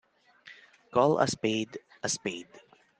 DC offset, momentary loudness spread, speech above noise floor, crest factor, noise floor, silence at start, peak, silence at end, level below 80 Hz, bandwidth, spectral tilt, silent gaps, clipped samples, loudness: under 0.1%; 15 LU; 27 dB; 22 dB; -55 dBFS; 0.45 s; -10 dBFS; 0.4 s; -72 dBFS; 10 kHz; -4 dB/octave; none; under 0.1%; -29 LUFS